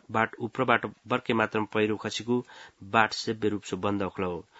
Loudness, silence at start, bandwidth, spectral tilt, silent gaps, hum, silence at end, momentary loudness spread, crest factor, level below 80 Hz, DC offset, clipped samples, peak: -28 LUFS; 0.1 s; 8 kHz; -5 dB/octave; none; none; 0.15 s; 6 LU; 24 dB; -68 dBFS; under 0.1%; under 0.1%; -4 dBFS